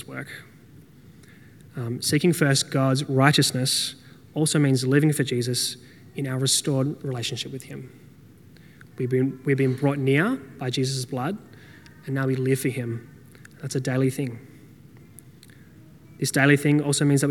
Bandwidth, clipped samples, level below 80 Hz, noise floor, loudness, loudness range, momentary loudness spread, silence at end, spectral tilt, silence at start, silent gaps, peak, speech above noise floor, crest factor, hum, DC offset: 18 kHz; under 0.1%; -66 dBFS; -50 dBFS; -23 LUFS; 7 LU; 16 LU; 0 s; -4.5 dB/octave; 0 s; none; 0 dBFS; 27 dB; 24 dB; none; under 0.1%